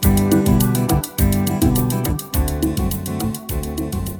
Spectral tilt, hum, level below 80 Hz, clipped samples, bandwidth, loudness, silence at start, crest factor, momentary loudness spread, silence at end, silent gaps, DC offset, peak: -6 dB/octave; none; -26 dBFS; under 0.1%; over 20 kHz; -19 LUFS; 0 s; 16 dB; 9 LU; 0 s; none; under 0.1%; -2 dBFS